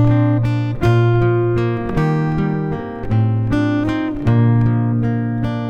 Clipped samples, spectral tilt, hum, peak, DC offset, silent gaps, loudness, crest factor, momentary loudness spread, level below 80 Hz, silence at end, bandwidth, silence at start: under 0.1%; -9.5 dB/octave; none; -4 dBFS; under 0.1%; none; -17 LUFS; 12 dB; 6 LU; -34 dBFS; 0 s; 6.4 kHz; 0 s